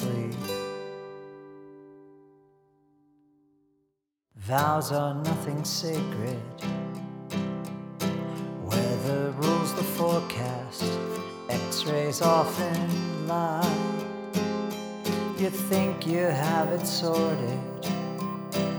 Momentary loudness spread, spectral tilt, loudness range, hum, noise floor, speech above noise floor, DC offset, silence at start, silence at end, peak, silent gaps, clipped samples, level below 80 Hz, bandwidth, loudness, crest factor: 10 LU; -5.5 dB/octave; 5 LU; none; -77 dBFS; 50 dB; under 0.1%; 0 s; 0 s; -8 dBFS; none; under 0.1%; -70 dBFS; over 20 kHz; -28 LUFS; 20 dB